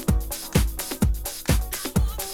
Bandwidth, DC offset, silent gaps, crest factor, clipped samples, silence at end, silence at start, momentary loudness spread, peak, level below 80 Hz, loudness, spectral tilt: 18.5 kHz; under 0.1%; none; 20 dB; under 0.1%; 0 s; 0 s; 3 LU; -4 dBFS; -26 dBFS; -26 LUFS; -5 dB/octave